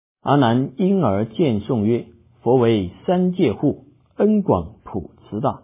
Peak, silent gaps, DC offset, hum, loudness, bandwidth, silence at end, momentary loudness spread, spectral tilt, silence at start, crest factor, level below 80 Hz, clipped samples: -4 dBFS; none; under 0.1%; none; -19 LUFS; 3.8 kHz; 0.05 s; 14 LU; -12 dB/octave; 0.25 s; 16 dB; -46 dBFS; under 0.1%